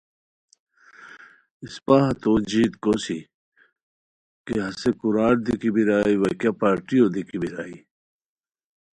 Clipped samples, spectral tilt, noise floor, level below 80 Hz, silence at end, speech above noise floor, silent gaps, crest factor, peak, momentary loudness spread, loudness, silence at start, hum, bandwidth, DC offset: under 0.1%; -6.5 dB/octave; -47 dBFS; -52 dBFS; 1.2 s; 26 dB; 1.51-1.60 s, 3.34-3.52 s, 3.83-4.45 s; 20 dB; -4 dBFS; 15 LU; -22 LUFS; 1 s; none; 11 kHz; under 0.1%